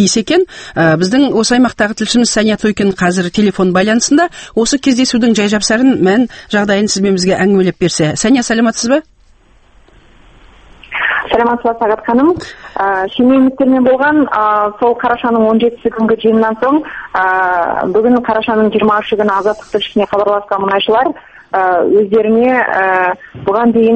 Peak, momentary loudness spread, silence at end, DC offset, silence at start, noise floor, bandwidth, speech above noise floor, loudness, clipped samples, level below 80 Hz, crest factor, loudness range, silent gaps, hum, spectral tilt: 0 dBFS; 5 LU; 0 s; under 0.1%; 0 s; -46 dBFS; 8.8 kHz; 35 dB; -12 LUFS; under 0.1%; -44 dBFS; 12 dB; 4 LU; none; none; -4.5 dB/octave